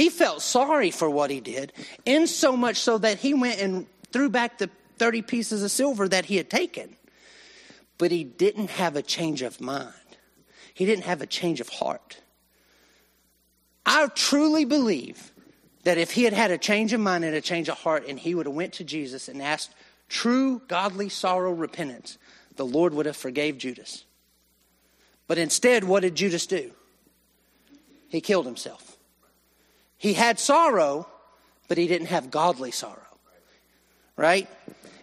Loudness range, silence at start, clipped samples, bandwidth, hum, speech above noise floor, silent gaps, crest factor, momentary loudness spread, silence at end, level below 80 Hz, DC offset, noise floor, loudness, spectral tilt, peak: 7 LU; 0 s; under 0.1%; 13.5 kHz; none; 42 dB; none; 20 dB; 13 LU; 0.15 s; -74 dBFS; under 0.1%; -66 dBFS; -25 LUFS; -3.5 dB/octave; -6 dBFS